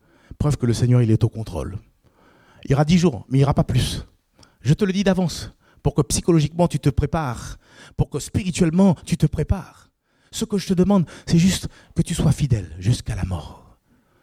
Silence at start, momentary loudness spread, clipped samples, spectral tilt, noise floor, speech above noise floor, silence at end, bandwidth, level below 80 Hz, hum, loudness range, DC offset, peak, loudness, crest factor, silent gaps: 0.4 s; 12 LU; under 0.1%; -6.5 dB/octave; -59 dBFS; 39 dB; 0.65 s; 15 kHz; -36 dBFS; none; 2 LU; under 0.1%; -4 dBFS; -21 LUFS; 16 dB; none